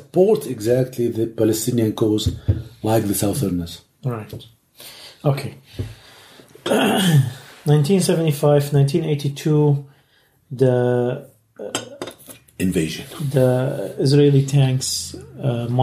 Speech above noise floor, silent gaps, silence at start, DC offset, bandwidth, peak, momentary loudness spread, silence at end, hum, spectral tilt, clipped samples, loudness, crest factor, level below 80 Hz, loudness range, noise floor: 40 dB; none; 0 s; under 0.1%; 15.5 kHz; -2 dBFS; 17 LU; 0 s; none; -6 dB/octave; under 0.1%; -19 LUFS; 18 dB; -46 dBFS; 6 LU; -59 dBFS